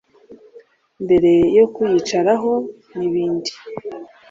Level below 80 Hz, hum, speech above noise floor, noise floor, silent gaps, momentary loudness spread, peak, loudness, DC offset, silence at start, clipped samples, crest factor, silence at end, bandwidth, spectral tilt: -52 dBFS; none; 31 dB; -48 dBFS; none; 18 LU; -2 dBFS; -17 LUFS; under 0.1%; 0.3 s; under 0.1%; 16 dB; 0.25 s; 7.6 kHz; -6 dB/octave